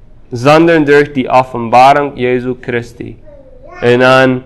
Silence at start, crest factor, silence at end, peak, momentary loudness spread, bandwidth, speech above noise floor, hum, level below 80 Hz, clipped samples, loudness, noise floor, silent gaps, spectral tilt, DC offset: 0.3 s; 10 dB; 0 s; 0 dBFS; 15 LU; 13 kHz; 24 dB; none; -40 dBFS; 1%; -9 LUFS; -33 dBFS; none; -6 dB/octave; under 0.1%